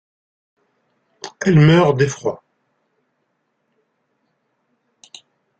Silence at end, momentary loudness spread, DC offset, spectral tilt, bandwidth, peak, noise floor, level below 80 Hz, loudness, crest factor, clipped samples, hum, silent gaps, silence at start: 3.25 s; 25 LU; under 0.1%; -6.5 dB/octave; 7.8 kHz; -2 dBFS; -70 dBFS; -54 dBFS; -15 LUFS; 20 dB; under 0.1%; none; none; 1.25 s